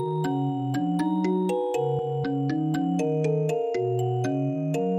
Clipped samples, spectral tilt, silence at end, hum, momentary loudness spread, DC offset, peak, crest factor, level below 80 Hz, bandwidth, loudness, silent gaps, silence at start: under 0.1%; -8 dB/octave; 0 s; none; 2 LU; under 0.1%; -14 dBFS; 10 dB; -66 dBFS; 13.5 kHz; -26 LUFS; none; 0 s